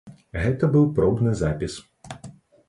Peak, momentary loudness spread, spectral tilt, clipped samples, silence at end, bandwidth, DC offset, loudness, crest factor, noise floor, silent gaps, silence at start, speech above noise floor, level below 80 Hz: -8 dBFS; 21 LU; -8 dB/octave; under 0.1%; 0.35 s; 11.5 kHz; under 0.1%; -22 LUFS; 16 dB; -45 dBFS; none; 0.05 s; 24 dB; -40 dBFS